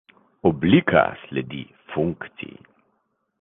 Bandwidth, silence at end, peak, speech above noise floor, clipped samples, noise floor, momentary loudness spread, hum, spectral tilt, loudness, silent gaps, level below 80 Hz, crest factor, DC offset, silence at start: 4 kHz; 1 s; -2 dBFS; 50 dB; under 0.1%; -71 dBFS; 19 LU; none; -10 dB/octave; -21 LUFS; none; -50 dBFS; 20 dB; under 0.1%; 0.45 s